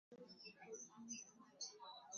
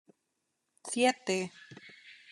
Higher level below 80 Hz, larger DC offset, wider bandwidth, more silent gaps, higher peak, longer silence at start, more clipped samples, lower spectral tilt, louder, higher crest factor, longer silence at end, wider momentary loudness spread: about the same, under -90 dBFS vs -90 dBFS; neither; second, 7.2 kHz vs 12 kHz; neither; second, -38 dBFS vs -12 dBFS; second, 0.1 s vs 0.85 s; neither; second, -1.5 dB/octave vs -3 dB/octave; second, -55 LUFS vs -31 LUFS; about the same, 20 dB vs 22 dB; second, 0 s vs 0.2 s; second, 7 LU vs 23 LU